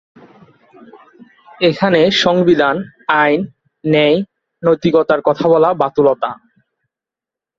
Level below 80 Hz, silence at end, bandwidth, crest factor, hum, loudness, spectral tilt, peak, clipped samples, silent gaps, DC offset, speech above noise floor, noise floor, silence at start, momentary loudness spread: -56 dBFS; 1.25 s; 7.6 kHz; 16 dB; none; -14 LUFS; -6 dB/octave; 0 dBFS; under 0.1%; none; under 0.1%; 74 dB; -87 dBFS; 1.6 s; 10 LU